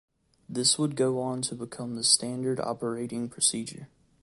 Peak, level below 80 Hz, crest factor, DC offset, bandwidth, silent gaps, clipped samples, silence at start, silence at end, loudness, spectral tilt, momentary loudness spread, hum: -4 dBFS; -68 dBFS; 26 dB; under 0.1%; 11.5 kHz; none; under 0.1%; 0.5 s; 0.35 s; -27 LUFS; -3 dB/octave; 14 LU; none